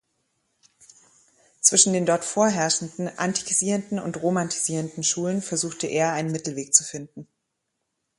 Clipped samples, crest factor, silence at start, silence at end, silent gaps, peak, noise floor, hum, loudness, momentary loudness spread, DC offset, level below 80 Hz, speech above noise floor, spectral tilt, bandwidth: under 0.1%; 24 dB; 1.65 s; 0.95 s; none; 0 dBFS; -79 dBFS; none; -22 LUFS; 11 LU; under 0.1%; -68 dBFS; 54 dB; -3 dB/octave; 11.5 kHz